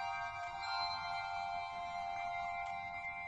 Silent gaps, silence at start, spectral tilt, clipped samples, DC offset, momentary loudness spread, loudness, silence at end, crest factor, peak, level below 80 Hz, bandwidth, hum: none; 0 s; -2.5 dB/octave; under 0.1%; under 0.1%; 4 LU; -41 LUFS; 0 s; 14 dB; -28 dBFS; -66 dBFS; 10.5 kHz; none